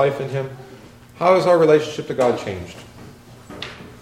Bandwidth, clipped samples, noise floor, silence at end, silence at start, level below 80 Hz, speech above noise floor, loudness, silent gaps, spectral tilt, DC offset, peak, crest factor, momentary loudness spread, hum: 14.5 kHz; under 0.1%; -42 dBFS; 0.05 s; 0 s; -54 dBFS; 23 dB; -18 LUFS; none; -6 dB/octave; under 0.1%; -2 dBFS; 18 dB; 23 LU; none